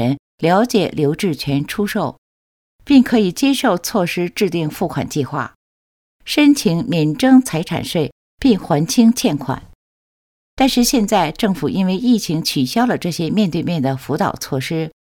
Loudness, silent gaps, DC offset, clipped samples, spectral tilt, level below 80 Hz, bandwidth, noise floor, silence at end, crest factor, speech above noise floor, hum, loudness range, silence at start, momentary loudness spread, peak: -17 LUFS; 0.19-0.38 s, 2.18-2.79 s, 5.55-6.19 s, 8.12-8.38 s, 9.75-10.57 s; under 0.1%; under 0.1%; -5 dB/octave; -46 dBFS; 18.5 kHz; under -90 dBFS; 0.1 s; 16 dB; over 74 dB; none; 3 LU; 0 s; 9 LU; 0 dBFS